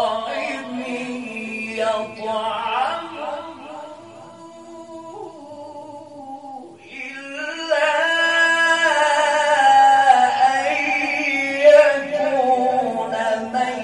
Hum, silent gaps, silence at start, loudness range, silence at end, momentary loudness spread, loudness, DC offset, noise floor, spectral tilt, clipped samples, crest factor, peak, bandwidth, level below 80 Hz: none; none; 0 s; 20 LU; 0 s; 23 LU; -18 LUFS; under 0.1%; -40 dBFS; -2 dB/octave; under 0.1%; 18 dB; -2 dBFS; 11.5 kHz; -68 dBFS